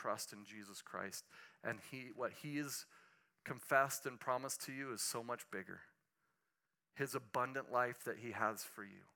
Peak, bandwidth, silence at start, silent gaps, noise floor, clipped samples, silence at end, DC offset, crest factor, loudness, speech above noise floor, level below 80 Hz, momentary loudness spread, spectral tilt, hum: -20 dBFS; 18 kHz; 0 s; none; -90 dBFS; under 0.1%; 0.1 s; under 0.1%; 26 dB; -43 LUFS; 46 dB; under -90 dBFS; 15 LU; -3 dB/octave; none